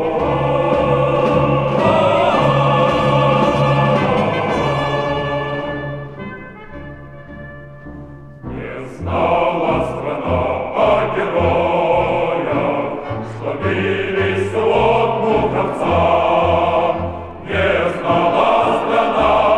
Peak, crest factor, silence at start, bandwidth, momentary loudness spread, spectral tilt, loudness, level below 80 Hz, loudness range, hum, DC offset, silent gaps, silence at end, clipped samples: -2 dBFS; 14 dB; 0 s; 10 kHz; 17 LU; -7 dB/octave; -16 LUFS; -40 dBFS; 9 LU; none; under 0.1%; none; 0 s; under 0.1%